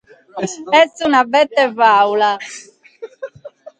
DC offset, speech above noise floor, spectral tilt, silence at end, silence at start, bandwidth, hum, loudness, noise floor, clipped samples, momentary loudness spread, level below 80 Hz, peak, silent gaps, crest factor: under 0.1%; 24 dB; -3 dB/octave; 0.1 s; 0.35 s; 9.4 kHz; none; -14 LUFS; -38 dBFS; under 0.1%; 21 LU; -64 dBFS; 0 dBFS; none; 16 dB